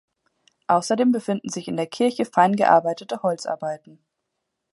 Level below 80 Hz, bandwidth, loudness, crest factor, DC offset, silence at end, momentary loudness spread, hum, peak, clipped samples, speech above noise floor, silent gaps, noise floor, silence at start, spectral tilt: -72 dBFS; 11.5 kHz; -22 LUFS; 20 dB; under 0.1%; 0.95 s; 11 LU; none; -4 dBFS; under 0.1%; 58 dB; none; -79 dBFS; 0.7 s; -5 dB/octave